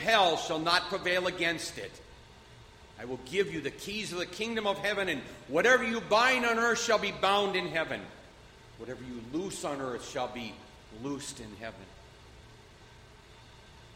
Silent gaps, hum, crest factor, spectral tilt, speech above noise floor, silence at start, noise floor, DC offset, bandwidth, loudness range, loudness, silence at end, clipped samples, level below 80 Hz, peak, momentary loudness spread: none; none; 22 dB; -3 dB/octave; 23 dB; 0 s; -54 dBFS; under 0.1%; 16 kHz; 13 LU; -30 LUFS; 0 s; under 0.1%; -60 dBFS; -10 dBFS; 19 LU